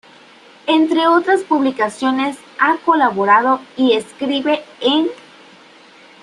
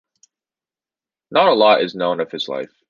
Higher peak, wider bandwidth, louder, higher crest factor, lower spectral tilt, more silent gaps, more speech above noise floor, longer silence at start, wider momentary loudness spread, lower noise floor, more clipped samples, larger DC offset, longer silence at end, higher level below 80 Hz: about the same, -2 dBFS vs -2 dBFS; first, 11.5 kHz vs 7.4 kHz; about the same, -16 LUFS vs -17 LUFS; about the same, 16 dB vs 18 dB; about the same, -4 dB/octave vs -5 dB/octave; neither; second, 29 dB vs over 73 dB; second, 0.65 s vs 1.3 s; second, 7 LU vs 12 LU; second, -44 dBFS vs under -90 dBFS; neither; neither; first, 1.1 s vs 0.25 s; about the same, -66 dBFS vs -68 dBFS